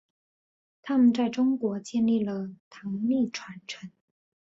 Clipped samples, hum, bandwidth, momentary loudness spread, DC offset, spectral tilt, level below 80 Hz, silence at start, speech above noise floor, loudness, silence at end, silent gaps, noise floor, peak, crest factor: under 0.1%; none; 7.8 kHz; 18 LU; under 0.1%; -6 dB/octave; -70 dBFS; 0.85 s; over 63 dB; -26 LUFS; 0.6 s; 2.60-2.71 s; under -90 dBFS; -12 dBFS; 16 dB